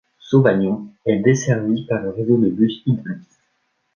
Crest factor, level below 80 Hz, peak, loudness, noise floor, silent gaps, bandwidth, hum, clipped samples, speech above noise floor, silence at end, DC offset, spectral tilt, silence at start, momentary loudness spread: 18 dB; -56 dBFS; -2 dBFS; -19 LUFS; -68 dBFS; none; 7.4 kHz; none; under 0.1%; 51 dB; 0.75 s; under 0.1%; -7 dB/octave; 0.25 s; 8 LU